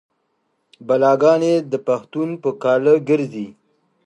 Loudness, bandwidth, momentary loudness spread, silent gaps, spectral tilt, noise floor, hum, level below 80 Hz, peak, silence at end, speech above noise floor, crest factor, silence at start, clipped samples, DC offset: -18 LUFS; 9.8 kHz; 11 LU; none; -7 dB/octave; -69 dBFS; none; -72 dBFS; -2 dBFS; 0.55 s; 52 dB; 16 dB; 0.8 s; under 0.1%; under 0.1%